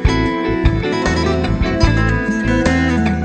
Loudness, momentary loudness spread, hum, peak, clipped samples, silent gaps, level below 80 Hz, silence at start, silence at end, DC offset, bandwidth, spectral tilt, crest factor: -16 LUFS; 3 LU; none; 0 dBFS; under 0.1%; none; -22 dBFS; 0 s; 0 s; under 0.1%; 9 kHz; -6.5 dB/octave; 14 dB